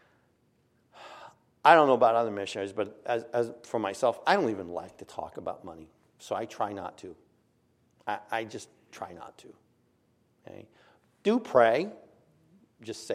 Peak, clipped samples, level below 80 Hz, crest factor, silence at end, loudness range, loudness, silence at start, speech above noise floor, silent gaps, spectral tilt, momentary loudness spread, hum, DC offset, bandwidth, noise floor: -4 dBFS; under 0.1%; -74 dBFS; 26 dB; 0 s; 15 LU; -28 LUFS; 1 s; 41 dB; none; -5 dB/octave; 25 LU; none; under 0.1%; 13.5 kHz; -69 dBFS